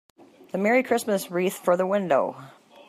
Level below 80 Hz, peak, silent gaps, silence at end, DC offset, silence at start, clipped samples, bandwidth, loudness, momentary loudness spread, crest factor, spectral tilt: -78 dBFS; -8 dBFS; none; 0.4 s; under 0.1%; 0.55 s; under 0.1%; 15.5 kHz; -24 LUFS; 9 LU; 16 dB; -5 dB/octave